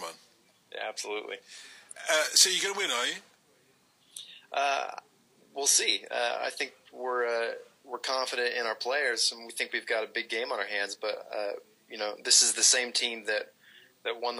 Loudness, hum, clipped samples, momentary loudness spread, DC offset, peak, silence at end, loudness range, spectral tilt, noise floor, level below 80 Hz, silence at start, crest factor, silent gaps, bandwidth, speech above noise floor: -28 LUFS; none; under 0.1%; 23 LU; under 0.1%; -6 dBFS; 0 s; 5 LU; 2 dB/octave; -66 dBFS; under -90 dBFS; 0 s; 26 dB; none; 15.5 kHz; 36 dB